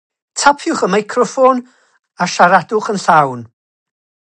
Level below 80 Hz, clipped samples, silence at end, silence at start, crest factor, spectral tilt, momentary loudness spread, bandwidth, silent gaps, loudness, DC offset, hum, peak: -60 dBFS; under 0.1%; 0.9 s; 0.35 s; 14 dB; -4 dB/octave; 10 LU; 10 kHz; none; -13 LUFS; under 0.1%; none; 0 dBFS